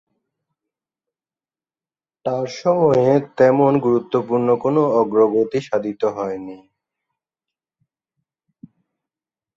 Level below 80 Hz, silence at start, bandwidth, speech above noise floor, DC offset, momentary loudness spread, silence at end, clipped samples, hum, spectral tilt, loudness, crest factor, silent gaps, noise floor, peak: -62 dBFS; 2.25 s; 7.4 kHz; over 73 dB; under 0.1%; 11 LU; 3 s; under 0.1%; none; -8 dB/octave; -18 LUFS; 18 dB; none; under -90 dBFS; -2 dBFS